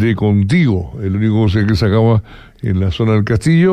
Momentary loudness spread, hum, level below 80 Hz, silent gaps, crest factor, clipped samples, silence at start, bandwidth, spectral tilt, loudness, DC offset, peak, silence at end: 7 LU; none; -34 dBFS; none; 10 dB; under 0.1%; 0 s; 10 kHz; -8 dB/octave; -14 LUFS; under 0.1%; -4 dBFS; 0 s